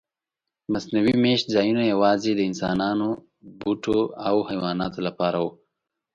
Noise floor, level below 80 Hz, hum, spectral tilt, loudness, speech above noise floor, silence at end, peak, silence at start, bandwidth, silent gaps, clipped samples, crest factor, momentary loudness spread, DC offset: -86 dBFS; -56 dBFS; none; -6 dB/octave; -23 LUFS; 64 dB; 0.65 s; -6 dBFS; 0.7 s; 7.6 kHz; none; under 0.1%; 18 dB; 9 LU; under 0.1%